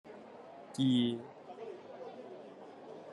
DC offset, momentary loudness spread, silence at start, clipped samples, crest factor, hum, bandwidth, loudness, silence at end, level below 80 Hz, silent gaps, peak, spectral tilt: under 0.1%; 21 LU; 0.05 s; under 0.1%; 18 dB; none; 11.5 kHz; -36 LUFS; 0 s; -80 dBFS; none; -20 dBFS; -6.5 dB/octave